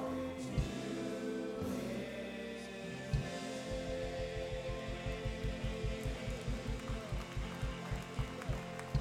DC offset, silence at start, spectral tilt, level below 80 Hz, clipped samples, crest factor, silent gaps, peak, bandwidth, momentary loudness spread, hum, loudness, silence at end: under 0.1%; 0 s; -6 dB/octave; -46 dBFS; under 0.1%; 20 dB; none; -20 dBFS; 16 kHz; 4 LU; none; -41 LUFS; 0 s